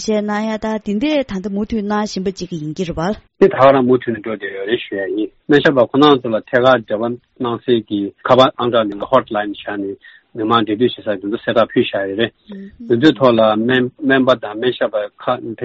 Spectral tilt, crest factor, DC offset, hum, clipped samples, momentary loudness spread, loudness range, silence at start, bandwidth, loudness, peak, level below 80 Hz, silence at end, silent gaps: -4 dB/octave; 16 dB; under 0.1%; none; under 0.1%; 12 LU; 4 LU; 0 s; 8 kHz; -16 LUFS; 0 dBFS; -48 dBFS; 0 s; none